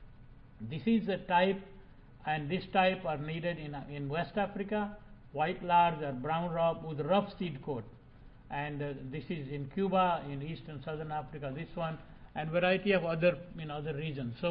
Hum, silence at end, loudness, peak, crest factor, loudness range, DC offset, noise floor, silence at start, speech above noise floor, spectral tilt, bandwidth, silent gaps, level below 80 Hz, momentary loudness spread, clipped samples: none; 0 s; -34 LUFS; -14 dBFS; 20 dB; 4 LU; under 0.1%; -55 dBFS; 0 s; 21 dB; -10 dB/octave; 5.2 kHz; none; -56 dBFS; 13 LU; under 0.1%